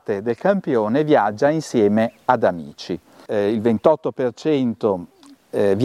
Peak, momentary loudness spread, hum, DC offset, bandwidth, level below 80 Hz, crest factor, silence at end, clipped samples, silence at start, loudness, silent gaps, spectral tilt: -2 dBFS; 11 LU; none; under 0.1%; 12.5 kHz; -62 dBFS; 18 dB; 0 s; under 0.1%; 0.1 s; -20 LUFS; none; -7 dB/octave